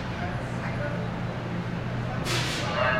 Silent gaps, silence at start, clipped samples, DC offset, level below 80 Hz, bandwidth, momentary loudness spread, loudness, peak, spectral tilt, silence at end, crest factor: none; 0 s; under 0.1%; under 0.1%; -44 dBFS; 15.5 kHz; 5 LU; -30 LUFS; -12 dBFS; -5 dB/octave; 0 s; 16 dB